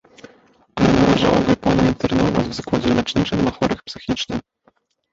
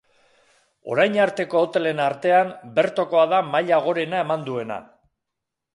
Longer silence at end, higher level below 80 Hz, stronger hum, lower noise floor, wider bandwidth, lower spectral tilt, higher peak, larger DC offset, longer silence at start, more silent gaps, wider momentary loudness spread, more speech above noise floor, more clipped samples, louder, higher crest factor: second, 0.7 s vs 0.95 s; first, -38 dBFS vs -72 dBFS; neither; second, -60 dBFS vs -82 dBFS; second, 7.8 kHz vs 11.5 kHz; about the same, -6 dB/octave vs -6 dB/octave; about the same, -2 dBFS vs -4 dBFS; neither; about the same, 0.75 s vs 0.85 s; neither; about the same, 11 LU vs 10 LU; second, 42 dB vs 62 dB; neither; about the same, -19 LUFS vs -21 LUFS; about the same, 16 dB vs 18 dB